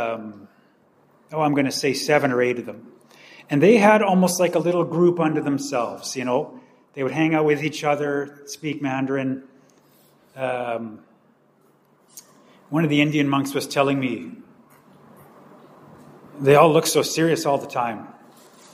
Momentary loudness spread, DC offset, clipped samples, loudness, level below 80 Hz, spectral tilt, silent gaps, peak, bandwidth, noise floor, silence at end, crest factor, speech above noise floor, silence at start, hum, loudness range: 16 LU; under 0.1%; under 0.1%; -21 LUFS; -70 dBFS; -5 dB/octave; none; 0 dBFS; 15.5 kHz; -59 dBFS; 0.6 s; 22 dB; 39 dB; 0 s; none; 10 LU